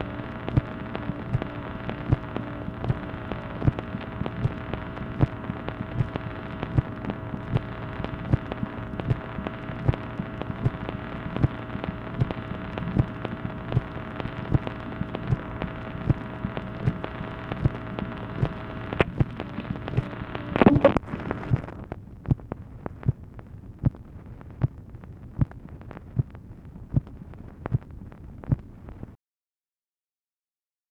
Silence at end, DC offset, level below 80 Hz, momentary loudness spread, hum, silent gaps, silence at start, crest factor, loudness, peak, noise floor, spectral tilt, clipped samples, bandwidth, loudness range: 1.75 s; under 0.1%; -40 dBFS; 13 LU; none; none; 0 s; 28 dB; -30 LUFS; 0 dBFS; under -90 dBFS; -9.5 dB/octave; under 0.1%; 5.6 kHz; 8 LU